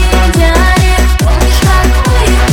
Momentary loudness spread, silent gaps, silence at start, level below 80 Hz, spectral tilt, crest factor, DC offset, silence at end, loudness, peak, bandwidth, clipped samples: 2 LU; none; 0 s; -8 dBFS; -5 dB/octave; 6 dB; under 0.1%; 0 s; -9 LUFS; 0 dBFS; 17.5 kHz; 0.3%